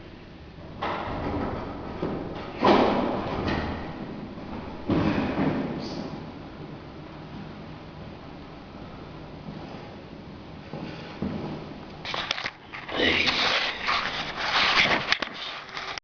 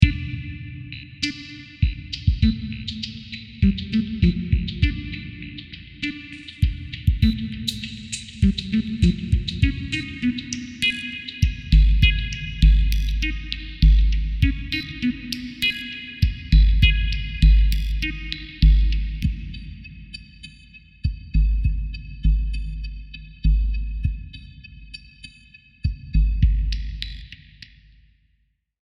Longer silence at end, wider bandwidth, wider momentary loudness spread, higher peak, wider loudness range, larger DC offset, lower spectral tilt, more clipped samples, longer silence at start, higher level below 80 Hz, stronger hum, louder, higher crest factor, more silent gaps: second, 0.05 s vs 1.5 s; second, 5.4 kHz vs 9.6 kHz; about the same, 21 LU vs 19 LU; second, -4 dBFS vs 0 dBFS; first, 18 LU vs 7 LU; neither; about the same, -5 dB/octave vs -5.5 dB/octave; neither; about the same, 0 s vs 0 s; second, -48 dBFS vs -22 dBFS; neither; second, -27 LUFS vs -23 LUFS; about the same, 26 dB vs 22 dB; neither